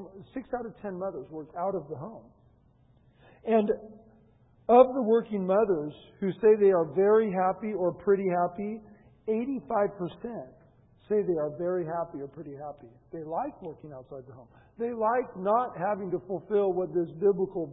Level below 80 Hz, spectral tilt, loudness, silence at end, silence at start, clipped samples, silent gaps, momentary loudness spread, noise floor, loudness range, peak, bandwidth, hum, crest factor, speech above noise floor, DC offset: -66 dBFS; -11.5 dB/octave; -28 LUFS; 0 s; 0 s; under 0.1%; none; 19 LU; -62 dBFS; 10 LU; -6 dBFS; 3.9 kHz; none; 22 dB; 34 dB; under 0.1%